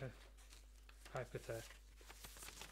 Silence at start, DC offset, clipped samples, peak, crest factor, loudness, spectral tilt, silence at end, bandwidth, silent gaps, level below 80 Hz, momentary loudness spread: 0 s; under 0.1%; under 0.1%; -32 dBFS; 22 dB; -54 LUFS; -4 dB/octave; 0 s; 16 kHz; none; -62 dBFS; 13 LU